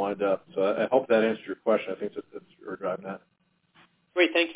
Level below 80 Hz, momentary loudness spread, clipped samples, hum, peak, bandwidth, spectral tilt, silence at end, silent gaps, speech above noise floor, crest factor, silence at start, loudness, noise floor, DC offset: -74 dBFS; 18 LU; under 0.1%; none; -8 dBFS; 4 kHz; -8.5 dB/octave; 0 s; none; 38 dB; 20 dB; 0 s; -27 LUFS; -65 dBFS; under 0.1%